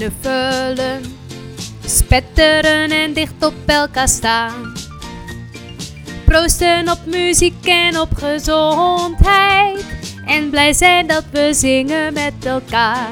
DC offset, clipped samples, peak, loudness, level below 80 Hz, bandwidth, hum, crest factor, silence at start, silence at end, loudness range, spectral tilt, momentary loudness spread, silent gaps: under 0.1%; 0.1%; 0 dBFS; -14 LUFS; -26 dBFS; over 20 kHz; none; 16 dB; 0 s; 0 s; 4 LU; -3 dB/octave; 18 LU; none